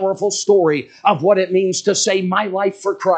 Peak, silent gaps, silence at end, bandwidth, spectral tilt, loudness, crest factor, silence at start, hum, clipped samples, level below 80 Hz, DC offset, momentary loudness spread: 0 dBFS; none; 0 s; 9.2 kHz; -4 dB/octave; -16 LUFS; 16 dB; 0 s; none; under 0.1%; -70 dBFS; under 0.1%; 5 LU